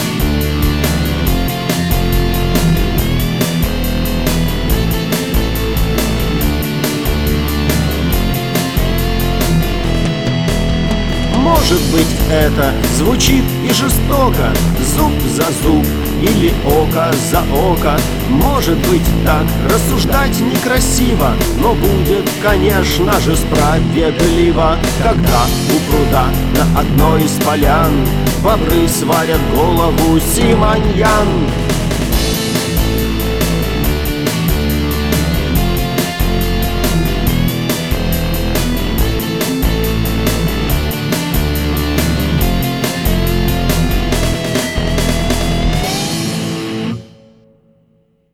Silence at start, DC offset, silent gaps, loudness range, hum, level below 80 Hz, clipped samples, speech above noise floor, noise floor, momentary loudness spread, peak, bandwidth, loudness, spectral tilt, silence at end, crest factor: 0 s; 2%; none; 3 LU; none; -20 dBFS; under 0.1%; 43 dB; -55 dBFS; 4 LU; 0 dBFS; 19 kHz; -14 LUFS; -5 dB/octave; 0 s; 12 dB